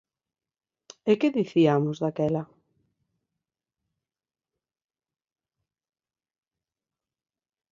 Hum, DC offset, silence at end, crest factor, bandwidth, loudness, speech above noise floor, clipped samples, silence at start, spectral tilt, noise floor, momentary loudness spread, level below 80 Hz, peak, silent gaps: none; under 0.1%; 5.3 s; 22 dB; 7.4 kHz; -25 LUFS; over 66 dB; under 0.1%; 1.05 s; -7.5 dB/octave; under -90 dBFS; 11 LU; -72 dBFS; -8 dBFS; none